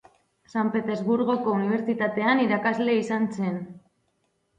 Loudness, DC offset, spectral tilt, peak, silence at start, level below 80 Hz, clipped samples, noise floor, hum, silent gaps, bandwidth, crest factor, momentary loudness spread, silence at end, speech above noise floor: -25 LUFS; under 0.1%; -7 dB/octave; -10 dBFS; 0.55 s; -70 dBFS; under 0.1%; -72 dBFS; none; none; 9 kHz; 16 dB; 8 LU; 0.8 s; 48 dB